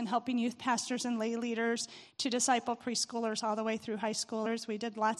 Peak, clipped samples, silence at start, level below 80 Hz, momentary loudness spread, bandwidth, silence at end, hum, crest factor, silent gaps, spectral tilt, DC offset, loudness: -16 dBFS; under 0.1%; 0 s; -82 dBFS; 5 LU; 12.5 kHz; 0 s; none; 18 dB; none; -2.5 dB/octave; under 0.1%; -34 LUFS